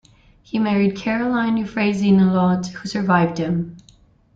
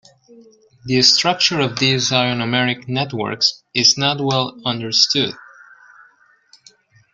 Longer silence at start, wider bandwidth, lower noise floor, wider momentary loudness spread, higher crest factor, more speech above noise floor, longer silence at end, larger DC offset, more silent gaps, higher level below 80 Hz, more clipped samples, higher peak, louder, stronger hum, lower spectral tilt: first, 0.55 s vs 0.35 s; second, 7.6 kHz vs 12 kHz; about the same, -53 dBFS vs -54 dBFS; about the same, 9 LU vs 10 LU; about the same, 16 dB vs 20 dB; about the same, 34 dB vs 36 dB; second, 0.55 s vs 1.75 s; neither; neither; first, -52 dBFS vs -58 dBFS; neither; second, -4 dBFS vs 0 dBFS; second, -19 LUFS vs -16 LUFS; neither; first, -7 dB/octave vs -3 dB/octave